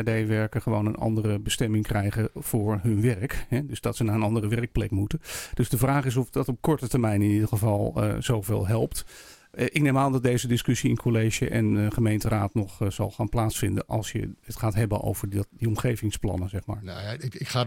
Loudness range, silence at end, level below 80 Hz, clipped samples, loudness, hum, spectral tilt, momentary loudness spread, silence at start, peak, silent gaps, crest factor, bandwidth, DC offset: 3 LU; 0 s; -42 dBFS; under 0.1%; -26 LUFS; none; -6 dB/octave; 8 LU; 0 s; -6 dBFS; none; 20 dB; 17 kHz; under 0.1%